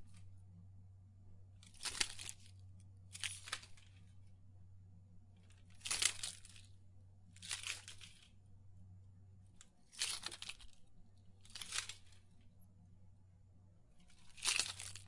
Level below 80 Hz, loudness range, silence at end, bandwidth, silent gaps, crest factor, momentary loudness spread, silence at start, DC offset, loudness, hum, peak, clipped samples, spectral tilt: -70 dBFS; 8 LU; 0 s; 12 kHz; none; 34 dB; 27 LU; 0 s; under 0.1%; -42 LUFS; none; -16 dBFS; under 0.1%; 0 dB/octave